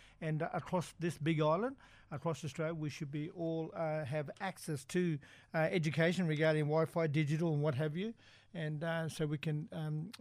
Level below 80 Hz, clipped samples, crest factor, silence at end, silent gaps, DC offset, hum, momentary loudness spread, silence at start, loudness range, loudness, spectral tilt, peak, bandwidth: -70 dBFS; under 0.1%; 16 dB; 0.05 s; none; under 0.1%; none; 10 LU; 0 s; 5 LU; -37 LUFS; -6.5 dB/octave; -20 dBFS; 13 kHz